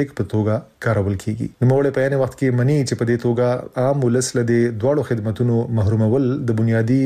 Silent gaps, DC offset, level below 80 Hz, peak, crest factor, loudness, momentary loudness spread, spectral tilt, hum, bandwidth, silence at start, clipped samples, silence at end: none; under 0.1%; -50 dBFS; -8 dBFS; 10 dB; -19 LUFS; 5 LU; -7 dB/octave; none; 13.5 kHz; 0 s; under 0.1%; 0 s